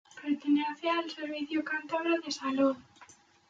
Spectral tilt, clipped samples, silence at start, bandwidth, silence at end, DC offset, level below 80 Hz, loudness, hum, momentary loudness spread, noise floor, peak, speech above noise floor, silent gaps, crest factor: -3.5 dB/octave; under 0.1%; 0.15 s; 7.6 kHz; 0.4 s; under 0.1%; -80 dBFS; -31 LUFS; none; 7 LU; -58 dBFS; -16 dBFS; 27 dB; none; 16 dB